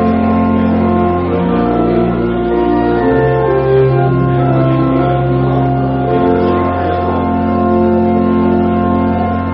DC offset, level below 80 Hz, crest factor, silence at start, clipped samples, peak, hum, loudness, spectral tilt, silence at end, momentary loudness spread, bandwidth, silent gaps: under 0.1%; -30 dBFS; 10 dB; 0 s; under 0.1%; -2 dBFS; none; -12 LUFS; -8 dB/octave; 0 s; 3 LU; 5.4 kHz; none